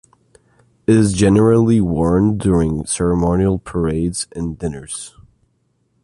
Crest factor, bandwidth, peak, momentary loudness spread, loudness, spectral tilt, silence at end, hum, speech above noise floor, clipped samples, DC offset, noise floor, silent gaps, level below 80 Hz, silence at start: 14 dB; 11.5 kHz; -2 dBFS; 13 LU; -16 LUFS; -6.5 dB/octave; 0.95 s; none; 48 dB; under 0.1%; under 0.1%; -64 dBFS; none; -34 dBFS; 0.9 s